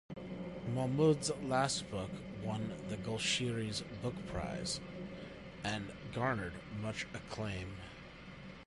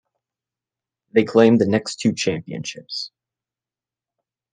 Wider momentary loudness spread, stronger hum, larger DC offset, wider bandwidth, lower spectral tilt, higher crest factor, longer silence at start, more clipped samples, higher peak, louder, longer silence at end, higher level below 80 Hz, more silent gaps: about the same, 14 LU vs 15 LU; neither; neither; first, 11.5 kHz vs 9.6 kHz; about the same, -4.5 dB/octave vs -5.5 dB/octave; about the same, 20 dB vs 20 dB; second, 0.1 s vs 1.15 s; neither; second, -18 dBFS vs -2 dBFS; second, -38 LUFS vs -19 LUFS; second, 0 s vs 1.45 s; first, -58 dBFS vs -66 dBFS; neither